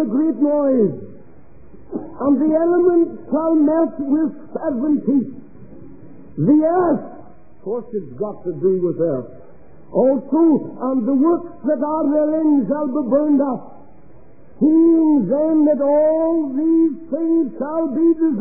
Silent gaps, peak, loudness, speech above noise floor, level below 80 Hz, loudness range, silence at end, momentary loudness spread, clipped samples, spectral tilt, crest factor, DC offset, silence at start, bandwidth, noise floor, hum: none; -4 dBFS; -18 LUFS; 30 dB; -58 dBFS; 5 LU; 0 s; 11 LU; under 0.1%; -15.5 dB/octave; 14 dB; 1%; 0 s; 2.4 kHz; -47 dBFS; none